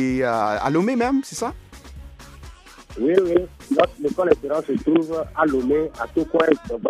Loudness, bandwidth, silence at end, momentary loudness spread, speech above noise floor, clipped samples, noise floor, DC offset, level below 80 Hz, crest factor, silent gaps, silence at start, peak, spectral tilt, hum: -21 LUFS; 14 kHz; 0 s; 10 LU; 22 dB; under 0.1%; -42 dBFS; under 0.1%; -44 dBFS; 20 dB; none; 0 s; 0 dBFS; -6 dB/octave; none